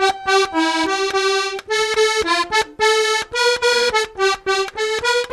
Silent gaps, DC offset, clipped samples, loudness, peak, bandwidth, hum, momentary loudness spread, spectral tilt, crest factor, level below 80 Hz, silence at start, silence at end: none; under 0.1%; under 0.1%; -17 LUFS; -4 dBFS; 14 kHz; none; 4 LU; -1 dB/octave; 14 dB; -50 dBFS; 0 s; 0 s